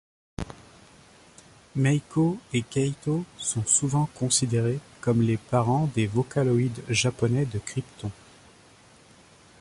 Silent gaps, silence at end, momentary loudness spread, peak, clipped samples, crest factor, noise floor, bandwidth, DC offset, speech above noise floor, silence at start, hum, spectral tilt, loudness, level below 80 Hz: none; 1.5 s; 15 LU; -8 dBFS; under 0.1%; 18 dB; -54 dBFS; 11.5 kHz; under 0.1%; 29 dB; 0.4 s; none; -5 dB/octave; -25 LUFS; -54 dBFS